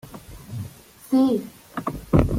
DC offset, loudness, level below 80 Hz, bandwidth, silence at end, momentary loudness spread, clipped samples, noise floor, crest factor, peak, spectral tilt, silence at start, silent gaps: under 0.1%; -23 LUFS; -36 dBFS; 16.5 kHz; 0 s; 20 LU; under 0.1%; -42 dBFS; 22 dB; -2 dBFS; -8 dB/octave; 0.05 s; none